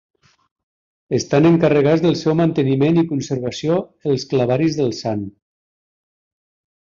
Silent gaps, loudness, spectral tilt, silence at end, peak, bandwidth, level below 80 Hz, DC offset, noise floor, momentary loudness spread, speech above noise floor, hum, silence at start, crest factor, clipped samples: none; -18 LUFS; -7 dB/octave; 1.55 s; -2 dBFS; 7.6 kHz; -54 dBFS; under 0.1%; under -90 dBFS; 10 LU; over 73 dB; none; 1.1 s; 16 dB; under 0.1%